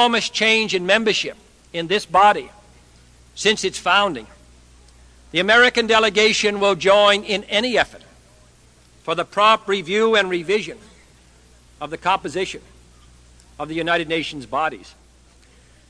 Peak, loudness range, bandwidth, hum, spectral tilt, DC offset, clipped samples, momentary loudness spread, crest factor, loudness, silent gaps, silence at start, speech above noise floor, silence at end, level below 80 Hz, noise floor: 0 dBFS; 10 LU; 11 kHz; none; -3 dB/octave; under 0.1%; under 0.1%; 15 LU; 20 dB; -18 LUFS; none; 0 s; 33 dB; 1.1 s; -52 dBFS; -51 dBFS